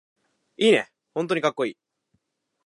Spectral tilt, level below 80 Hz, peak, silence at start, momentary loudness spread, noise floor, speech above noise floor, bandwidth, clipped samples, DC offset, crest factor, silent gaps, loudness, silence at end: -4.5 dB/octave; -80 dBFS; -6 dBFS; 0.6 s; 11 LU; -77 dBFS; 54 dB; 11.5 kHz; under 0.1%; under 0.1%; 20 dB; none; -24 LUFS; 0.95 s